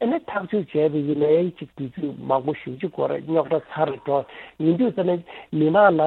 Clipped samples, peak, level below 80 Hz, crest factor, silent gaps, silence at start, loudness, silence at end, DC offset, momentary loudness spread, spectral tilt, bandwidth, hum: under 0.1%; -4 dBFS; -64 dBFS; 18 dB; none; 0 s; -23 LUFS; 0 s; under 0.1%; 10 LU; -10 dB/octave; 4.3 kHz; none